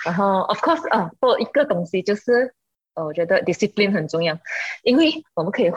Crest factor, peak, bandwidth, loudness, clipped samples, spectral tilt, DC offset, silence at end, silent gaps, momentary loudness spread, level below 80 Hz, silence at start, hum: 14 dB; -6 dBFS; 8.6 kHz; -20 LUFS; under 0.1%; -5.5 dB/octave; under 0.1%; 0 s; none; 8 LU; -64 dBFS; 0 s; none